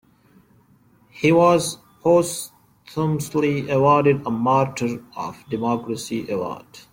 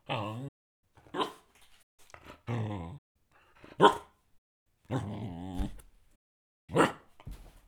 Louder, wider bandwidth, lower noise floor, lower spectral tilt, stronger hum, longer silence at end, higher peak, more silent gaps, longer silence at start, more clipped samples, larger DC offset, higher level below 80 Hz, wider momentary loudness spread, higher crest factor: first, -21 LUFS vs -32 LUFS; second, 16.5 kHz vs 20 kHz; second, -56 dBFS vs -60 dBFS; about the same, -6 dB/octave vs -5.5 dB/octave; neither; about the same, 0.15 s vs 0.1 s; about the same, -4 dBFS vs -6 dBFS; second, none vs 0.48-0.83 s, 1.83-1.98 s, 2.98-3.15 s, 4.38-4.66 s, 6.16-6.68 s; first, 1.15 s vs 0.1 s; neither; neither; second, -58 dBFS vs -52 dBFS; second, 15 LU vs 26 LU; second, 18 dB vs 28 dB